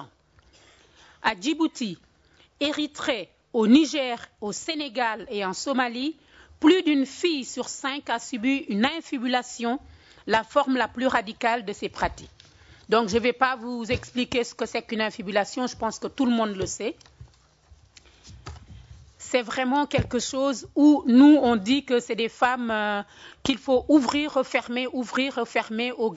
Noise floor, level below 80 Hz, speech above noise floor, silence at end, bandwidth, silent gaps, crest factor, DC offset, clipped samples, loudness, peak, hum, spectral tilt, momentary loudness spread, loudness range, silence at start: -60 dBFS; -54 dBFS; 36 dB; 0 s; 8 kHz; none; 20 dB; under 0.1%; under 0.1%; -24 LUFS; -6 dBFS; none; -4 dB/octave; 12 LU; 9 LU; 0 s